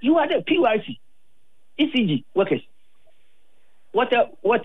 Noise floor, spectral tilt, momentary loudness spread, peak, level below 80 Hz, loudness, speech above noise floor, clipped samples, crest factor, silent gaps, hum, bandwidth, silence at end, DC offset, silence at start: -70 dBFS; -8 dB/octave; 10 LU; -8 dBFS; -70 dBFS; -22 LUFS; 49 dB; under 0.1%; 14 dB; none; none; 4.1 kHz; 0 s; 0.8%; 0 s